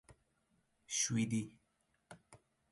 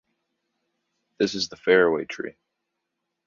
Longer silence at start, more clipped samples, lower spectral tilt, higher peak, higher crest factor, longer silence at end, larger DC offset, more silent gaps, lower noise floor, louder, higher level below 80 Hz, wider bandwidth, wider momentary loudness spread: second, 0.1 s vs 1.2 s; neither; about the same, -3.5 dB/octave vs -4 dB/octave; second, -24 dBFS vs -4 dBFS; about the same, 20 dB vs 22 dB; second, 0.35 s vs 0.95 s; neither; neither; about the same, -80 dBFS vs -81 dBFS; second, -37 LUFS vs -23 LUFS; second, -74 dBFS vs -66 dBFS; first, 11.5 kHz vs 7.4 kHz; first, 25 LU vs 15 LU